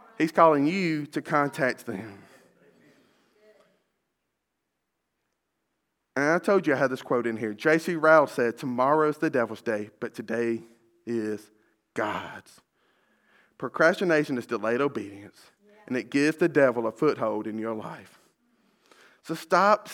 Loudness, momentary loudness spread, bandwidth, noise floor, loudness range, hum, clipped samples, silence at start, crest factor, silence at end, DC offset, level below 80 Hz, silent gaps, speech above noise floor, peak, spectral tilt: -25 LUFS; 17 LU; 17 kHz; -81 dBFS; 10 LU; none; under 0.1%; 0.2 s; 22 dB; 0 s; under 0.1%; -80 dBFS; none; 56 dB; -4 dBFS; -6 dB/octave